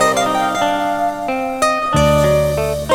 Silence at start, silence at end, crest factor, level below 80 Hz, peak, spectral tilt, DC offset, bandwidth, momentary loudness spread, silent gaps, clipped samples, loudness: 0 s; 0 s; 14 dB; -32 dBFS; -2 dBFS; -4.5 dB/octave; under 0.1%; 19.5 kHz; 6 LU; none; under 0.1%; -16 LUFS